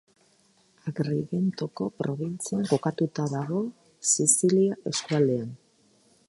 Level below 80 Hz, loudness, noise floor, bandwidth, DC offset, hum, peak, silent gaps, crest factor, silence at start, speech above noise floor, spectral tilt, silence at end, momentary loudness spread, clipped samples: -70 dBFS; -26 LUFS; -64 dBFS; 12 kHz; under 0.1%; none; -6 dBFS; none; 20 dB; 0.85 s; 37 dB; -5 dB/octave; 0.75 s; 12 LU; under 0.1%